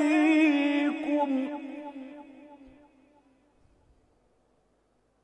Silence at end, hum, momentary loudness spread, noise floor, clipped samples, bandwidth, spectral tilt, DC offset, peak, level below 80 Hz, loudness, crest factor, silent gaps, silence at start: 2.7 s; none; 23 LU; -70 dBFS; under 0.1%; 8.8 kHz; -4 dB/octave; under 0.1%; -12 dBFS; -72 dBFS; -26 LUFS; 16 dB; none; 0 s